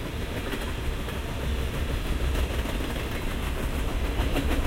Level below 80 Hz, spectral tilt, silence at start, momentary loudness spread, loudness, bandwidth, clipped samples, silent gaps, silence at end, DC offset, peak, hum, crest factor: -30 dBFS; -5.5 dB/octave; 0 s; 4 LU; -30 LUFS; 16 kHz; under 0.1%; none; 0 s; under 0.1%; -12 dBFS; none; 16 dB